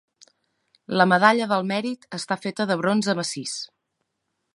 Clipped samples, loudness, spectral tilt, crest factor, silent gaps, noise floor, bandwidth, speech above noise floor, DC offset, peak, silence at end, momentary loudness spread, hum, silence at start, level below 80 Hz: under 0.1%; -23 LUFS; -4.5 dB/octave; 22 dB; none; -78 dBFS; 11.5 kHz; 55 dB; under 0.1%; -2 dBFS; 0.9 s; 14 LU; none; 0.9 s; -74 dBFS